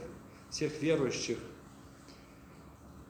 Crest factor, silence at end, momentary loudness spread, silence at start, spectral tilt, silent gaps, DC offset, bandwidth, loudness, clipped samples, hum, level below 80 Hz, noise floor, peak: 20 dB; 0 s; 23 LU; 0 s; -4.5 dB/octave; none; under 0.1%; 19.5 kHz; -34 LUFS; under 0.1%; none; -62 dBFS; -54 dBFS; -18 dBFS